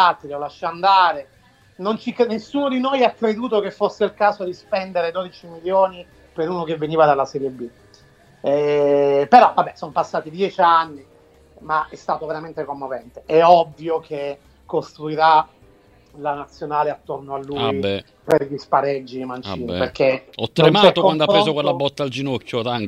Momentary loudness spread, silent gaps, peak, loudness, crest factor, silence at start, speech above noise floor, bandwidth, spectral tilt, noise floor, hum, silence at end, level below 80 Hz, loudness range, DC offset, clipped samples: 15 LU; none; 0 dBFS; -19 LUFS; 20 dB; 0 s; 32 dB; 12 kHz; -6 dB/octave; -51 dBFS; none; 0 s; -56 dBFS; 5 LU; under 0.1%; under 0.1%